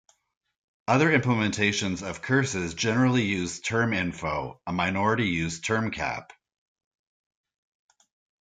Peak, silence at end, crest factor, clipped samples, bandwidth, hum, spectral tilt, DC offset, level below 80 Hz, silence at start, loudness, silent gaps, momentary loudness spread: -6 dBFS; 2.2 s; 20 dB; under 0.1%; 9.4 kHz; none; -5 dB/octave; under 0.1%; -58 dBFS; 0.9 s; -26 LUFS; none; 9 LU